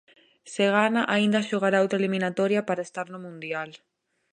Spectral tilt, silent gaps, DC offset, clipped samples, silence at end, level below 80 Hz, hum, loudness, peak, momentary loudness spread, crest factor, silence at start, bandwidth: -5.5 dB/octave; none; under 0.1%; under 0.1%; 0.55 s; -76 dBFS; none; -25 LUFS; -6 dBFS; 14 LU; 18 dB; 0.45 s; 10 kHz